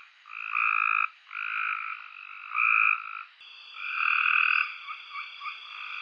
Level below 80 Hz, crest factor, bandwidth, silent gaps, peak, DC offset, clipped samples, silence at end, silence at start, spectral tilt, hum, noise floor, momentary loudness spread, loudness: under -90 dBFS; 20 dB; 6.6 kHz; none; -10 dBFS; under 0.1%; under 0.1%; 0 s; 0.25 s; 4.5 dB/octave; none; -49 dBFS; 20 LU; -25 LUFS